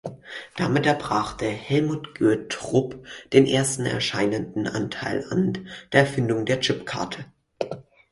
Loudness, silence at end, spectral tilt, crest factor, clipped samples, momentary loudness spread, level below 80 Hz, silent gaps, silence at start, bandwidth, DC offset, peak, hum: -24 LUFS; 0.3 s; -5 dB/octave; 22 dB; under 0.1%; 13 LU; -54 dBFS; none; 0.05 s; 11.5 kHz; under 0.1%; -2 dBFS; none